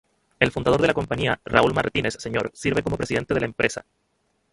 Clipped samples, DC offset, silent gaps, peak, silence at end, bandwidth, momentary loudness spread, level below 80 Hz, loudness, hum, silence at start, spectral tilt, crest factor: under 0.1%; under 0.1%; none; -2 dBFS; 0.7 s; 11.5 kHz; 6 LU; -46 dBFS; -23 LUFS; none; 0.4 s; -5 dB/octave; 22 dB